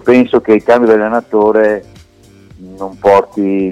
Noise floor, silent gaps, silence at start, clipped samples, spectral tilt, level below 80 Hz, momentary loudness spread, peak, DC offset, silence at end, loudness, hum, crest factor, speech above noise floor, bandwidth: -42 dBFS; none; 0.05 s; under 0.1%; -7 dB/octave; -48 dBFS; 9 LU; 0 dBFS; under 0.1%; 0 s; -11 LUFS; none; 12 dB; 31 dB; 9.6 kHz